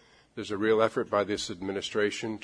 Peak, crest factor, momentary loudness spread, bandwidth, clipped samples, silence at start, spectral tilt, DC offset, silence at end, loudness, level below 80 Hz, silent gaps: -8 dBFS; 20 dB; 11 LU; 10.5 kHz; under 0.1%; 0.35 s; -4 dB/octave; under 0.1%; 0 s; -29 LUFS; -64 dBFS; none